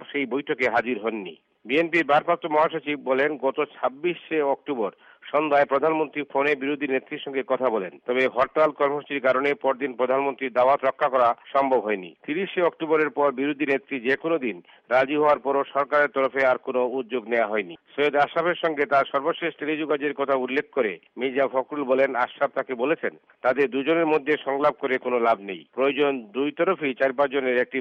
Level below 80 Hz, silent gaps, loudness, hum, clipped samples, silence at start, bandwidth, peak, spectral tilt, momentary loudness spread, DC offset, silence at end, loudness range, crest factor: -72 dBFS; none; -24 LUFS; none; under 0.1%; 0 s; 7.6 kHz; -10 dBFS; -6.5 dB/octave; 7 LU; under 0.1%; 0 s; 2 LU; 14 dB